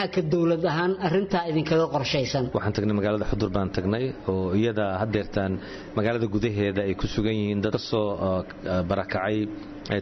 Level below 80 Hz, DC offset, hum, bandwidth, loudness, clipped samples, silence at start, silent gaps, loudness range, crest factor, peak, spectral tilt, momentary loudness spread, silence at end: -44 dBFS; under 0.1%; none; 6.2 kHz; -26 LUFS; under 0.1%; 0 s; none; 2 LU; 14 dB; -12 dBFS; -5.5 dB/octave; 5 LU; 0 s